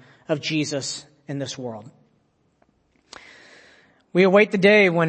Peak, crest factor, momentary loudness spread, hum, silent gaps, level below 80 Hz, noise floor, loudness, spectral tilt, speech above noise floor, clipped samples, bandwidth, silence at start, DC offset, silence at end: -2 dBFS; 20 dB; 19 LU; none; none; -70 dBFS; -65 dBFS; -20 LUFS; -5 dB/octave; 46 dB; under 0.1%; 8.8 kHz; 0.3 s; under 0.1%; 0 s